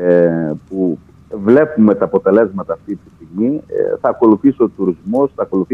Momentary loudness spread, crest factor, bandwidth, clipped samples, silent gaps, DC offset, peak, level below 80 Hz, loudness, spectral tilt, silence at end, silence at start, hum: 12 LU; 14 dB; 4.1 kHz; under 0.1%; none; under 0.1%; 0 dBFS; -50 dBFS; -15 LUFS; -10.5 dB/octave; 0 s; 0 s; none